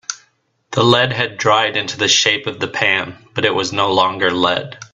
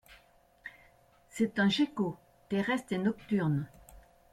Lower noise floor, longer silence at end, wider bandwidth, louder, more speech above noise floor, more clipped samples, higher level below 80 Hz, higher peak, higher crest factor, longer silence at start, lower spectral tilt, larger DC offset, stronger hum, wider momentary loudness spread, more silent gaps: about the same, -61 dBFS vs -63 dBFS; second, 0.1 s vs 0.35 s; second, 8.4 kHz vs 13.5 kHz; first, -15 LUFS vs -32 LUFS; first, 44 dB vs 33 dB; neither; first, -56 dBFS vs -64 dBFS; first, 0 dBFS vs -16 dBFS; about the same, 18 dB vs 16 dB; about the same, 0.1 s vs 0.1 s; second, -3 dB/octave vs -6 dB/octave; neither; second, none vs 60 Hz at -60 dBFS; second, 10 LU vs 21 LU; neither